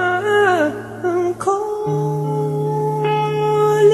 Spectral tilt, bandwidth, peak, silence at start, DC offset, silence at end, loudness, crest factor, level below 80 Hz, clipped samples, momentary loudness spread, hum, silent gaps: -6.5 dB/octave; 13 kHz; -2 dBFS; 0 s; under 0.1%; 0 s; -18 LUFS; 14 dB; -58 dBFS; under 0.1%; 6 LU; none; none